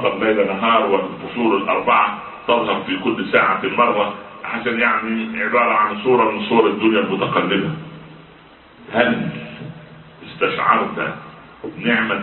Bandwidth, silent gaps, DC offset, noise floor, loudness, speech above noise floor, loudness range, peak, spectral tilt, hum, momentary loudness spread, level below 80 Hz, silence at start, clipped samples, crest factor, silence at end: 4.3 kHz; none; under 0.1%; -45 dBFS; -18 LUFS; 27 dB; 5 LU; 0 dBFS; -10.5 dB/octave; none; 13 LU; -56 dBFS; 0 s; under 0.1%; 18 dB; 0 s